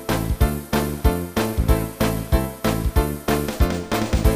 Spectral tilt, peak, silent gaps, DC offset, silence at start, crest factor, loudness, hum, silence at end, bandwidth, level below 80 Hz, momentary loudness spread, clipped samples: -6 dB/octave; -4 dBFS; none; under 0.1%; 0 s; 16 dB; -22 LUFS; none; 0 s; 16 kHz; -24 dBFS; 3 LU; under 0.1%